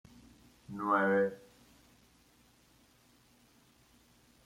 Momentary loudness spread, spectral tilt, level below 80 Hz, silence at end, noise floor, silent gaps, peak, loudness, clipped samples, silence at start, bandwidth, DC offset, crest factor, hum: 21 LU; -7 dB/octave; -72 dBFS; 3.1 s; -66 dBFS; none; -16 dBFS; -31 LUFS; under 0.1%; 0.7 s; 16 kHz; under 0.1%; 24 dB; none